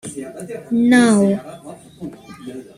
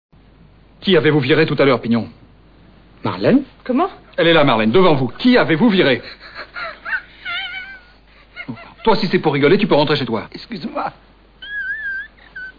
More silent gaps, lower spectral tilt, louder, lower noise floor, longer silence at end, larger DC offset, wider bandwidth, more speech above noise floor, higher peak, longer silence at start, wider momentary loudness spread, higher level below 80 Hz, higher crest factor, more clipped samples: neither; second, -5.5 dB/octave vs -8 dB/octave; about the same, -15 LUFS vs -16 LUFS; second, -34 dBFS vs -47 dBFS; first, 0.15 s vs 0 s; neither; first, 12.5 kHz vs 5.2 kHz; second, 19 dB vs 32 dB; about the same, -2 dBFS vs -4 dBFS; about the same, 0.05 s vs 0.15 s; first, 24 LU vs 18 LU; second, -58 dBFS vs -46 dBFS; about the same, 16 dB vs 14 dB; neither